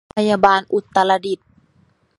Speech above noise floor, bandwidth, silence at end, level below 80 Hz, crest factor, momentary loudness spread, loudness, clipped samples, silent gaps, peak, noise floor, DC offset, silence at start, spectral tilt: 42 dB; 11.5 kHz; 0.85 s; -56 dBFS; 18 dB; 10 LU; -17 LUFS; under 0.1%; none; 0 dBFS; -58 dBFS; under 0.1%; 0.15 s; -5 dB/octave